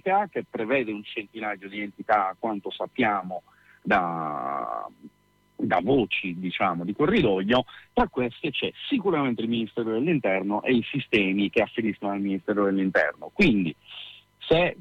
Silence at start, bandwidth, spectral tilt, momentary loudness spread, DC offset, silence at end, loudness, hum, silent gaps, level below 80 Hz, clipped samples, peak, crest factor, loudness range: 0.05 s; 8.4 kHz; -7.5 dB/octave; 11 LU; under 0.1%; 0.05 s; -26 LUFS; none; none; -52 dBFS; under 0.1%; -10 dBFS; 16 dB; 3 LU